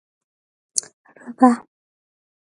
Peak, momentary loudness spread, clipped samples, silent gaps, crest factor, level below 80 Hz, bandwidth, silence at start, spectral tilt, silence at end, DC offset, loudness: 0 dBFS; 12 LU; under 0.1%; 0.93-1.04 s; 24 dB; -72 dBFS; 11.5 kHz; 0.75 s; -3 dB/octave; 0.85 s; under 0.1%; -20 LUFS